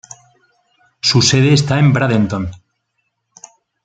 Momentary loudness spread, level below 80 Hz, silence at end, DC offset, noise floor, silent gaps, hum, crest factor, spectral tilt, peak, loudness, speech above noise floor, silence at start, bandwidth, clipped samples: 10 LU; -48 dBFS; 1.3 s; under 0.1%; -70 dBFS; none; none; 14 dB; -5 dB/octave; -2 dBFS; -13 LUFS; 57 dB; 1.05 s; 9.2 kHz; under 0.1%